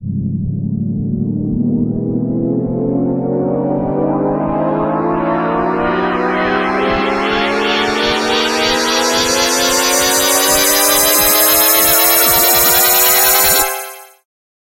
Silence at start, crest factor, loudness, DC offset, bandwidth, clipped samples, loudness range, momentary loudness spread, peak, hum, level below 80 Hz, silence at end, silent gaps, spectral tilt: 0 s; 14 dB; -12 LUFS; under 0.1%; 17 kHz; under 0.1%; 8 LU; 10 LU; 0 dBFS; none; -38 dBFS; 0.55 s; none; -2.5 dB/octave